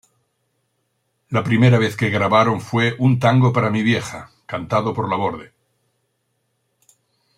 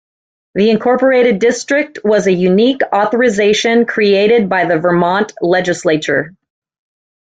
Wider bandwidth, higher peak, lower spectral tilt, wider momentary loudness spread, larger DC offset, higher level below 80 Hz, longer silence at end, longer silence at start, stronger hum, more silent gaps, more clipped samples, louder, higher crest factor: first, 11.5 kHz vs 9.2 kHz; about the same, -2 dBFS vs 0 dBFS; first, -7 dB/octave vs -5 dB/octave; first, 13 LU vs 5 LU; neither; about the same, -56 dBFS vs -54 dBFS; first, 1.9 s vs 0.95 s; first, 1.3 s vs 0.55 s; neither; neither; neither; second, -18 LUFS vs -12 LUFS; first, 18 dB vs 12 dB